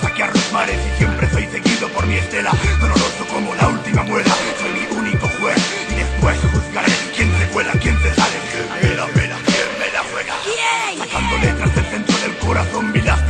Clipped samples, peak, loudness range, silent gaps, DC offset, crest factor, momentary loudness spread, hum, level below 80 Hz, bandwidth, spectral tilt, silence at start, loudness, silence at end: under 0.1%; -2 dBFS; 1 LU; none; under 0.1%; 16 dB; 4 LU; none; -24 dBFS; 10.5 kHz; -4.5 dB/octave; 0 s; -17 LUFS; 0 s